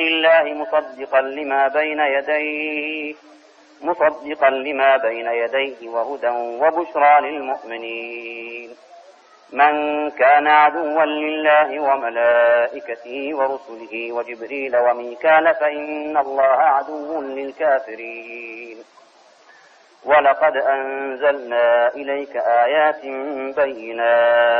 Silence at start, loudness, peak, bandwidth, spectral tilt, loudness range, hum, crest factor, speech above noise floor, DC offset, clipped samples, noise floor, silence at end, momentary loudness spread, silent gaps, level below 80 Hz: 0 s; -18 LUFS; -4 dBFS; 6 kHz; -4.5 dB/octave; 5 LU; none; 16 dB; 32 dB; under 0.1%; under 0.1%; -50 dBFS; 0 s; 14 LU; none; -66 dBFS